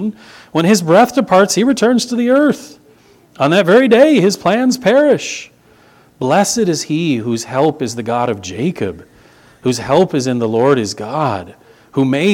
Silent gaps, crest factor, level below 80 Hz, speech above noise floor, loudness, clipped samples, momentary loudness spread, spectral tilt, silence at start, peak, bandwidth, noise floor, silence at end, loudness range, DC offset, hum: none; 14 dB; -54 dBFS; 34 dB; -14 LUFS; under 0.1%; 12 LU; -5 dB/octave; 0 s; 0 dBFS; 17.5 kHz; -47 dBFS; 0 s; 5 LU; under 0.1%; none